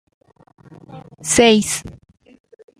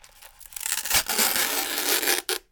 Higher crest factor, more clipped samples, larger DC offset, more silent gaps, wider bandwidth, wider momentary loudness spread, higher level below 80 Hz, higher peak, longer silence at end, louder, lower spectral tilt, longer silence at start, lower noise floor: about the same, 20 dB vs 22 dB; neither; neither; neither; second, 15.5 kHz vs 19.5 kHz; first, 18 LU vs 7 LU; about the same, -50 dBFS vs -54 dBFS; first, 0 dBFS vs -4 dBFS; first, 0.9 s vs 0.15 s; first, -16 LUFS vs -22 LUFS; first, -3 dB/octave vs 0.5 dB/octave; first, 0.9 s vs 0.2 s; second, -40 dBFS vs -48 dBFS